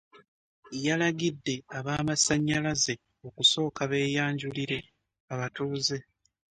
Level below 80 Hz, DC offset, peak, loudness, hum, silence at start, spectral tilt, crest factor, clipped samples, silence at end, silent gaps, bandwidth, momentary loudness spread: -60 dBFS; under 0.1%; -10 dBFS; -28 LUFS; none; 0.15 s; -3.5 dB/octave; 20 dB; under 0.1%; 0.55 s; 0.28-0.63 s, 5.20-5.28 s; 11 kHz; 12 LU